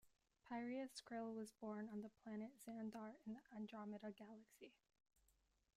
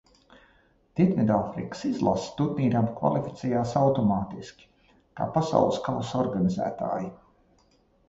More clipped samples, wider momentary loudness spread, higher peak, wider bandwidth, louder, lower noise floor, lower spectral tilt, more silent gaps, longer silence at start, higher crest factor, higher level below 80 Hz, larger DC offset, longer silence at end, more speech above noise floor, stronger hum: neither; about the same, 12 LU vs 10 LU; second, -40 dBFS vs -6 dBFS; first, 15 kHz vs 8 kHz; second, -54 LUFS vs -26 LUFS; first, -83 dBFS vs -64 dBFS; second, -5.5 dB/octave vs -7.5 dB/octave; neither; second, 0.05 s vs 0.95 s; second, 14 dB vs 20 dB; second, -90 dBFS vs -56 dBFS; neither; about the same, 1.05 s vs 0.95 s; second, 29 dB vs 38 dB; neither